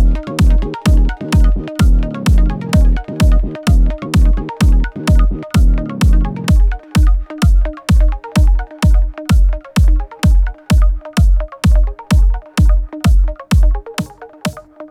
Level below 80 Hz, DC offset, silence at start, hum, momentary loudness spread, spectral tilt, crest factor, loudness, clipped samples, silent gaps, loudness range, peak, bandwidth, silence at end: -12 dBFS; under 0.1%; 0 s; none; 3 LU; -6.5 dB/octave; 10 dB; -15 LUFS; under 0.1%; none; 1 LU; -2 dBFS; 13 kHz; 0.05 s